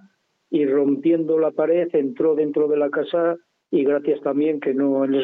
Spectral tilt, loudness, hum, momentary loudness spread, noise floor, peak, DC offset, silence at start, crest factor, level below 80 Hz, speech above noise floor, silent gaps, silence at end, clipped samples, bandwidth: -9.5 dB/octave; -21 LUFS; none; 3 LU; -58 dBFS; -8 dBFS; under 0.1%; 0.5 s; 12 dB; -78 dBFS; 39 dB; none; 0 s; under 0.1%; 4 kHz